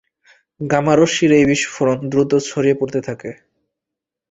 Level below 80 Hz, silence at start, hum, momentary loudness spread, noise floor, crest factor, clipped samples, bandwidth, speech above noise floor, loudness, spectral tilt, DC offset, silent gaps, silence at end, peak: -52 dBFS; 0.6 s; none; 15 LU; -84 dBFS; 16 dB; under 0.1%; 8.4 kHz; 68 dB; -16 LUFS; -5 dB/octave; under 0.1%; none; 0.95 s; -2 dBFS